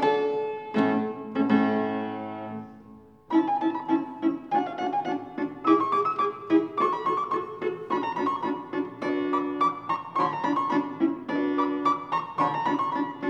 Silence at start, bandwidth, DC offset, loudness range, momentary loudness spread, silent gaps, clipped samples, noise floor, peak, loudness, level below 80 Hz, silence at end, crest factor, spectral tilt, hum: 0 s; 7.4 kHz; under 0.1%; 2 LU; 8 LU; none; under 0.1%; -50 dBFS; -8 dBFS; -27 LUFS; -72 dBFS; 0 s; 18 dB; -7 dB/octave; none